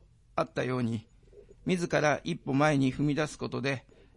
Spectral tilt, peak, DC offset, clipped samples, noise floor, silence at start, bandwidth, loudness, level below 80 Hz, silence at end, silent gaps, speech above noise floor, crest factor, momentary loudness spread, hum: -6 dB/octave; -12 dBFS; under 0.1%; under 0.1%; -55 dBFS; 0.35 s; 11.5 kHz; -30 LUFS; -58 dBFS; 0.35 s; none; 26 dB; 18 dB; 10 LU; none